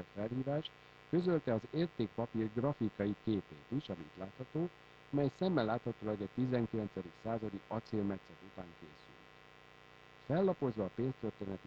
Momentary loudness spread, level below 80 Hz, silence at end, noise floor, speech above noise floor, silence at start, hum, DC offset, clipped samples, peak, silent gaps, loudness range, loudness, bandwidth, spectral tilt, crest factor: 23 LU; -68 dBFS; 0 s; -60 dBFS; 22 dB; 0 s; 60 Hz at -60 dBFS; under 0.1%; under 0.1%; -20 dBFS; none; 5 LU; -38 LUFS; 8 kHz; -9 dB/octave; 18 dB